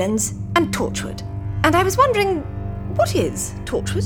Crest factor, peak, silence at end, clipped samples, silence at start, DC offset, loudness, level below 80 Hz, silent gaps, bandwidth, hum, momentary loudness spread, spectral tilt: 18 dB; -2 dBFS; 0 s; under 0.1%; 0 s; under 0.1%; -20 LUFS; -36 dBFS; none; 19.5 kHz; 50 Hz at -40 dBFS; 12 LU; -4.5 dB/octave